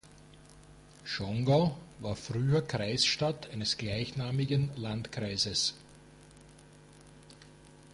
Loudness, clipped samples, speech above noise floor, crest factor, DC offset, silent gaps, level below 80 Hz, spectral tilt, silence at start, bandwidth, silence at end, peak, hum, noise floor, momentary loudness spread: -31 LUFS; under 0.1%; 24 dB; 18 dB; under 0.1%; none; -58 dBFS; -4.5 dB/octave; 0.05 s; 11.5 kHz; 0 s; -16 dBFS; 50 Hz at -55 dBFS; -55 dBFS; 11 LU